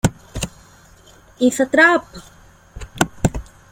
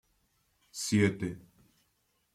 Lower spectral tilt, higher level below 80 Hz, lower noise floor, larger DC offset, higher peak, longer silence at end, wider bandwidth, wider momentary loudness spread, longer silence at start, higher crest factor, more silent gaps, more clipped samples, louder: about the same, -4.5 dB/octave vs -5 dB/octave; first, -36 dBFS vs -66 dBFS; second, -47 dBFS vs -75 dBFS; neither; first, 0 dBFS vs -12 dBFS; second, 0.3 s vs 0.95 s; first, 17 kHz vs 15 kHz; first, 24 LU vs 19 LU; second, 0.05 s vs 0.75 s; about the same, 20 dB vs 24 dB; neither; neither; first, -18 LUFS vs -31 LUFS